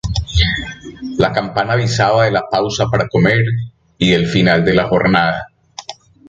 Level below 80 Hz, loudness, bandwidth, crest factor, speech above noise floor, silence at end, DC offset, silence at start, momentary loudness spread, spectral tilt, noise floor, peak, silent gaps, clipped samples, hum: -30 dBFS; -15 LUFS; 7.8 kHz; 16 dB; 20 dB; 0.35 s; under 0.1%; 0.05 s; 17 LU; -5.5 dB/octave; -34 dBFS; 0 dBFS; none; under 0.1%; none